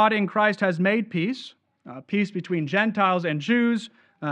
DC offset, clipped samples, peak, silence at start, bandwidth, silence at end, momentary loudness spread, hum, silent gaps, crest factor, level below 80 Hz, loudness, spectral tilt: under 0.1%; under 0.1%; -6 dBFS; 0 s; 9.2 kHz; 0 s; 15 LU; none; none; 18 dB; -76 dBFS; -23 LUFS; -6.5 dB/octave